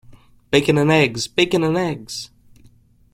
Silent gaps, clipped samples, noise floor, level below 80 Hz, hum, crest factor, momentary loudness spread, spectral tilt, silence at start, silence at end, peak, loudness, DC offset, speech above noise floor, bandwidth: none; under 0.1%; -51 dBFS; -50 dBFS; none; 18 dB; 15 LU; -5 dB/octave; 0.5 s; 0.85 s; -2 dBFS; -18 LUFS; under 0.1%; 33 dB; 16 kHz